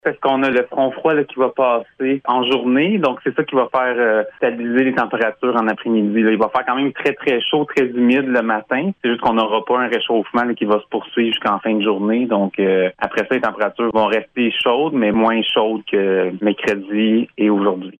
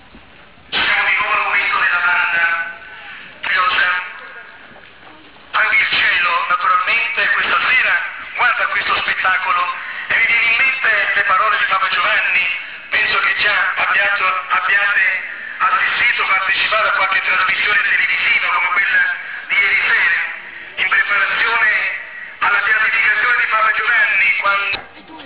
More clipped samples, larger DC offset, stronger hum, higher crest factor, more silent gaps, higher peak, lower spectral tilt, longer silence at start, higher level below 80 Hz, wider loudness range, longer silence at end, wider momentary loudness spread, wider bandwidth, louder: neither; second, under 0.1% vs 0.4%; neither; about the same, 14 dB vs 12 dB; neither; about the same, -4 dBFS vs -6 dBFS; first, -6.5 dB/octave vs -3.5 dB/octave; about the same, 0.05 s vs 0.15 s; about the same, -58 dBFS vs -54 dBFS; about the same, 1 LU vs 3 LU; about the same, 0.1 s vs 0 s; second, 4 LU vs 9 LU; first, 7.6 kHz vs 4 kHz; second, -17 LUFS vs -14 LUFS